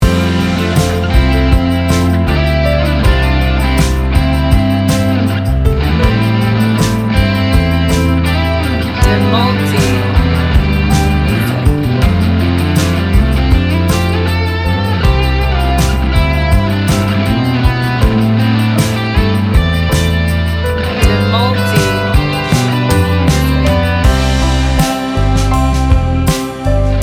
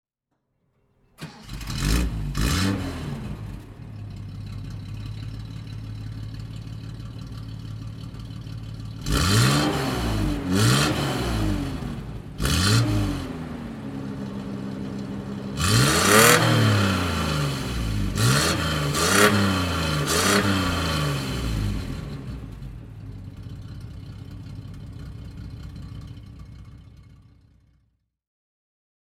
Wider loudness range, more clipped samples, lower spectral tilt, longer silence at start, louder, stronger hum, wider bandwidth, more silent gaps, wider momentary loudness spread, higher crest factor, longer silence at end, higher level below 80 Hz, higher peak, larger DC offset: second, 1 LU vs 19 LU; neither; first, -6 dB/octave vs -4 dB/octave; second, 0 s vs 1.2 s; first, -12 LUFS vs -22 LUFS; neither; about the same, 17.5 kHz vs 16.5 kHz; neither; second, 2 LU vs 20 LU; second, 10 dB vs 24 dB; second, 0 s vs 1.9 s; first, -16 dBFS vs -36 dBFS; about the same, 0 dBFS vs -2 dBFS; neither